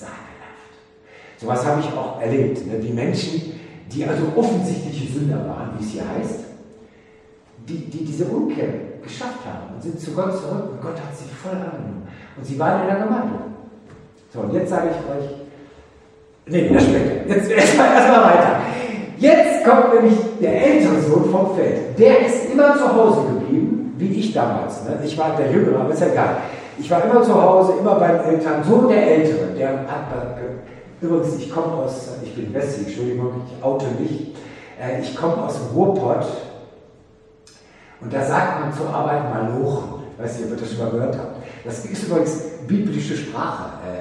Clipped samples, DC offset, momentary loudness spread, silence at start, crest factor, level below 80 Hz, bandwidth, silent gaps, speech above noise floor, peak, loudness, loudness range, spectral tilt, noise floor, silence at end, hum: under 0.1%; under 0.1%; 18 LU; 0 s; 18 dB; -52 dBFS; 11.5 kHz; none; 32 dB; 0 dBFS; -18 LUFS; 13 LU; -6.5 dB/octave; -50 dBFS; 0 s; none